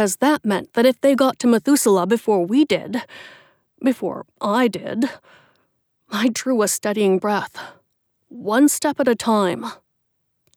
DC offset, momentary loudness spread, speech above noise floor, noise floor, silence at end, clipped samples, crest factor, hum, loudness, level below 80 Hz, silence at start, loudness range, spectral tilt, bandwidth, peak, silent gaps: under 0.1%; 13 LU; 53 dB; -71 dBFS; 0.8 s; under 0.1%; 16 dB; none; -19 LUFS; -70 dBFS; 0 s; 5 LU; -4 dB/octave; 18 kHz; -4 dBFS; none